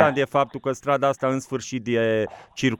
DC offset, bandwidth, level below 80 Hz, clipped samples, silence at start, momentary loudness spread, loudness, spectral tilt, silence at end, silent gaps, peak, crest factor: under 0.1%; 13 kHz; -60 dBFS; under 0.1%; 0 s; 7 LU; -24 LUFS; -5.5 dB/octave; 0.05 s; none; -2 dBFS; 20 dB